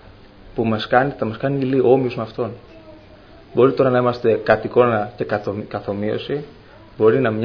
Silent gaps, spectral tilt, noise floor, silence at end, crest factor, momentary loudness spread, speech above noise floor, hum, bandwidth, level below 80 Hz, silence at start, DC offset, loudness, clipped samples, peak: none; -9 dB/octave; -44 dBFS; 0 s; 20 dB; 12 LU; 26 dB; none; 5.4 kHz; -50 dBFS; 0.05 s; under 0.1%; -19 LUFS; under 0.1%; 0 dBFS